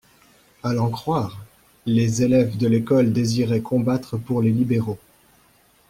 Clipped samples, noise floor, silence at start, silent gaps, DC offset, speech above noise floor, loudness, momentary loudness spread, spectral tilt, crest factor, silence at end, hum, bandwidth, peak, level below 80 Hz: under 0.1%; -57 dBFS; 0.65 s; none; under 0.1%; 37 dB; -21 LUFS; 12 LU; -7 dB/octave; 14 dB; 0.95 s; none; 15.5 kHz; -8 dBFS; -54 dBFS